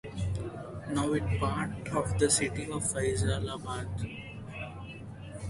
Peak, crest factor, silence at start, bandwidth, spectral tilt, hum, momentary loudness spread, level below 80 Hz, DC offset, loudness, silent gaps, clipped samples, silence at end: -12 dBFS; 20 dB; 0.05 s; 11.5 kHz; -4.5 dB/octave; none; 16 LU; -44 dBFS; under 0.1%; -32 LUFS; none; under 0.1%; 0 s